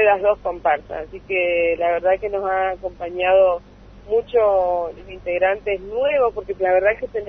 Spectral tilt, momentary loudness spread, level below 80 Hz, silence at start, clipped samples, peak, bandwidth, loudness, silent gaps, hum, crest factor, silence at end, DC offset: -6.5 dB/octave; 11 LU; -46 dBFS; 0 s; under 0.1%; -4 dBFS; 4.8 kHz; -20 LUFS; none; 50 Hz at -45 dBFS; 14 dB; 0 s; under 0.1%